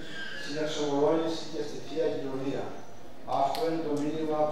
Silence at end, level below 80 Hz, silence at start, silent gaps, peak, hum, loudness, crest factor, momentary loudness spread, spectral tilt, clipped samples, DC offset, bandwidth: 0 s; -64 dBFS; 0 s; none; -14 dBFS; none; -31 LUFS; 16 dB; 11 LU; -5 dB/octave; under 0.1%; 2%; 15.5 kHz